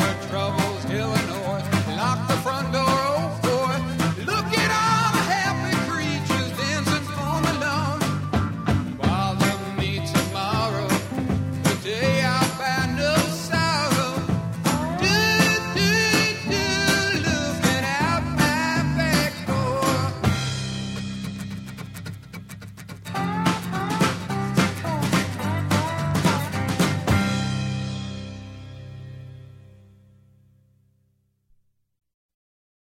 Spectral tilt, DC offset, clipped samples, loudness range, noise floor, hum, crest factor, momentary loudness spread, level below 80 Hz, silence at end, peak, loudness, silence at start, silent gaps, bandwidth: -4.5 dB/octave; under 0.1%; under 0.1%; 7 LU; -67 dBFS; none; 20 dB; 12 LU; -44 dBFS; 3.25 s; -4 dBFS; -23 LUFS; 0 s; none; 16.5 kHz